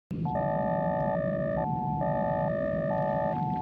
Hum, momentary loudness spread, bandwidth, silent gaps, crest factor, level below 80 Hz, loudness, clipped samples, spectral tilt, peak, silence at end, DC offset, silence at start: none; 1 LU; 4.9 kHz; none; 12 dB; -50 dBFS; -29 LUFS; under 0.1%; -11 dB/octave; -16 dBFS; 0 s; under 0.1%; 0.1 s